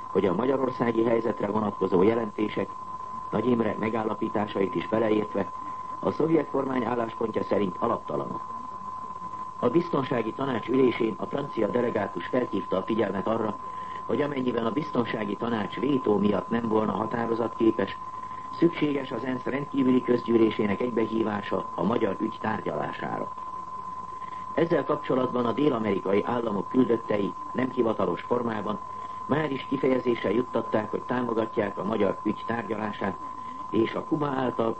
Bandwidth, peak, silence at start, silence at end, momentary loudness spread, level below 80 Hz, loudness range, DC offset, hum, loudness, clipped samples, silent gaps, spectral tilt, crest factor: 8.6 kHz; -10 dBFS; 0 s; 0 s; 11 LU; -60 dBFS; 3 LU; 0.4%; none; -28 LUFS; under 0.1%; none; -8 dB/octave; 18 dB